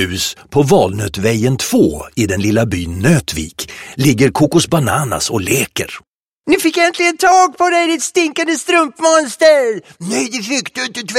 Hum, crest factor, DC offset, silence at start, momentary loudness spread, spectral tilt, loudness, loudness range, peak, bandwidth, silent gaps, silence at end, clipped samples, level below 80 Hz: none; 14 dB; under 0.1%; 0 s; 10 LU; -4.5 dB/octave; -14 LUFS; 3 LU; 0 dBFS; 16.5 kHz; 6.08-6.37 s; 0 s; under 0.1%; -42 dBFS